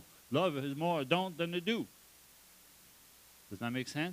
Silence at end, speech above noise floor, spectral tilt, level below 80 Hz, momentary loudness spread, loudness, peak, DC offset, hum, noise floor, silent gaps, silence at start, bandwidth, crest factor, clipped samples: 0 s; 26 dB; -5.5 dB/octave; -76 dBFS; 9 LU; -35 LUFS; -14 dBFS; under 0.1%; none; -61 dBFS; none; 0 s; 15.5 kHz; 24 dB; under 0.1%